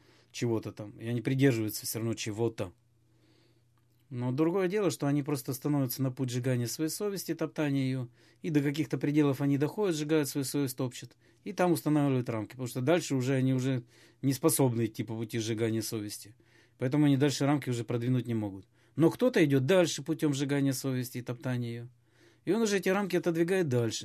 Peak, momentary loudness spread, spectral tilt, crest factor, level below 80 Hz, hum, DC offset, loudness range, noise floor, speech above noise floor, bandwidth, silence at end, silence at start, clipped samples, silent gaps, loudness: -12 dBFS; 11 LU; -6 dB/octave; 18 dB; -70 dBFS; none; under 0.1%; 4 LU; -68 dBFS; 38 dB; 15 kHz; 0 s; 0.35 s; under 0.1%; none; -30 LUFS